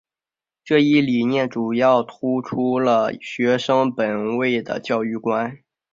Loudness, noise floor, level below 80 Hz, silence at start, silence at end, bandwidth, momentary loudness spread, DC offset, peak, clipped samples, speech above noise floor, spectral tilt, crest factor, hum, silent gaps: -20 LUFS; under -90 dBFS; -64 dBFS; 0.65 s; 0.4 s; 7.6 kHz; 7 LU; under 0.1%; -4 dBFS; under 0.1%; over 71 dB; -6.5 dB/octave; 16 dB; none; none